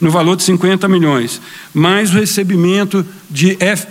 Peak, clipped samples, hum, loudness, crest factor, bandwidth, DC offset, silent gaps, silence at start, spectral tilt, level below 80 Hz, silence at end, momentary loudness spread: 0 dBFS; under 0.1%; none; -13 LUFS; 12 dB; 16.5 kHz; under 0.1%; none; 0 s; -5 dB/octave; -56 dBFS; 0 s; 8 LU